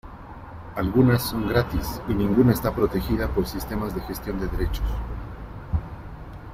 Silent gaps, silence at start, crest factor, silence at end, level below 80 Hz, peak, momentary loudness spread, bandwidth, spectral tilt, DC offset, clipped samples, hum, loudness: none; 0.05 s; 18 dB; 0 s; -34 dBFS; -6 dBFS; 20 LU; 16 kHz; -7 dB/octave; under 0.1%; under 0.1%; none; -25 LUFS